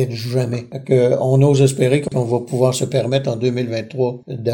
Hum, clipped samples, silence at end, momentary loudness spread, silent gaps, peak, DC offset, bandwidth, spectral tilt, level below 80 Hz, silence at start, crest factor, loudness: none; under 0.1%; 0 s; 9 LU; none; -2 dBFS; under 0.1%; 17 kHz; -6.5 dB/octave; -52 dBFS; 0 s; 16 dB; -18 LUFS